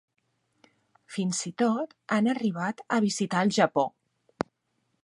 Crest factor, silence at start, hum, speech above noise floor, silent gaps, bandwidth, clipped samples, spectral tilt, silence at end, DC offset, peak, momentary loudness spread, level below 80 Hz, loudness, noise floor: 22 dB; 1.1 s; none; 49 dB; none; 11.5 kHz; under 0.1%; -5 dB/octave; 1.15 s; under 0.1%; -8 dBFS; 13 LU; -72 dBFS; -28 LUFS; -76 dBFS